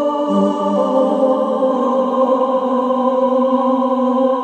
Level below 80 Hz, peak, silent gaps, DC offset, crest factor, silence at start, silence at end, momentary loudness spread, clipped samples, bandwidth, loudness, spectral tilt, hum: -74 dBFS; -2 dBFS; none; under 0.1%; 12 dB; 0 s; 0 s; 2 LU; under 0.1%; 8.6 kHz; -16 LUFS; -8 dB/octave; none